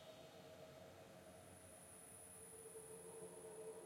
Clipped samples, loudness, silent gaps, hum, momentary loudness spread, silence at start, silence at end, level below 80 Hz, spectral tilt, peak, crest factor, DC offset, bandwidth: under 0.1%; -58 LUFS; none; none; 5 LU; 0 s; 0 s; -84 dBFS; -3.5 dB/octave; -44 dBFS; 14 dB; under 0.1%; 16 kHz